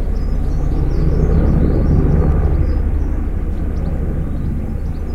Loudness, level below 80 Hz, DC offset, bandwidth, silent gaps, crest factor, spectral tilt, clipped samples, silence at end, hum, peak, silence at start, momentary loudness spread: -18 LUFS; -16 dBFS; under 0.1%; 6 kHz; none; 14 dB; -10 dB/octave; under 0.1%; 0 s; none; 0 dBFS; 0 s; 7 LU